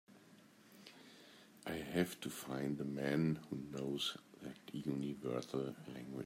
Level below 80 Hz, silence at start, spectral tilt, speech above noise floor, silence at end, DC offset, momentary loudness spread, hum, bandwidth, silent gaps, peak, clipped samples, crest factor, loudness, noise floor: -74 dBFS; 0.1 s; -5.5 dB/octave; 23 dB; 0 s; under 0.1%; 20 LU; none; 16 kHz; none; -22 dBFS; under 0.1%; 20 dB; -42 LUFS; -64 dBFS